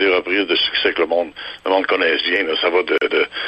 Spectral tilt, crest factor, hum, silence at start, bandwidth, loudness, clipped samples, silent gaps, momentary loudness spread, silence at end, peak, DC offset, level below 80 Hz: -4.5 dB/octave; 14 dB; none; 0 s; 8.4 kHz; -17 LUFS; under 0.1%; none; 4 LU; 0 s; -4 dBFS; under 0.1%; -56 dBFS